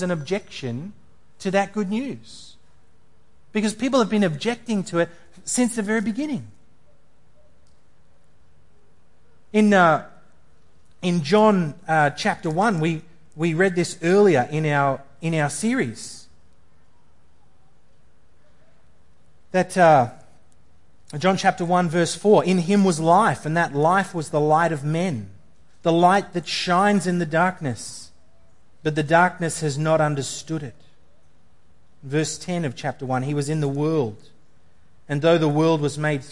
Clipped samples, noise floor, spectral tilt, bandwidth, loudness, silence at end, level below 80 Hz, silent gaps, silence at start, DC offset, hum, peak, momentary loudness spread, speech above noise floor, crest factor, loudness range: under 0.1%; -61 dBFS; -5.5 dB/octave; 11.5 kHz; -21 LUFS; 0 s; -60 dBFS; none; 0 s; 0.6%; none; -4 dBFS; 12 LU; 40 dB; 20 dB; 8 LU